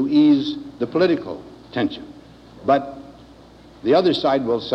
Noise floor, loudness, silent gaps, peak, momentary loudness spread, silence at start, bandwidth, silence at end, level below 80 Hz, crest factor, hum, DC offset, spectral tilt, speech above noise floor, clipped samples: -45 dBFS; -20 LUFS; none; -4 dBFS; 19 LU; 0 s; 6.4 kHz; 0 s; -54 dBFS; 16 dB; none; under 0.1%; -7 dB/octave; 27 dB; under 0.1%